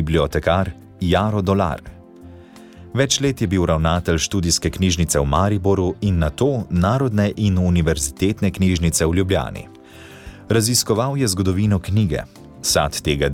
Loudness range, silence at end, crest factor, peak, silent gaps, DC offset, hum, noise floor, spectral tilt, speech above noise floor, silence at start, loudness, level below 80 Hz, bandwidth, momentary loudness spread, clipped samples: 2 LU; 0 s; 14 dB; -4 dBFS; none; under 0.1%; none; -41 dBFS; -5 dB/octave; 23 dB; 0 s; -19 LUFS; -34 dBFS; 17.5 kHz; 7 LU; under 0.1%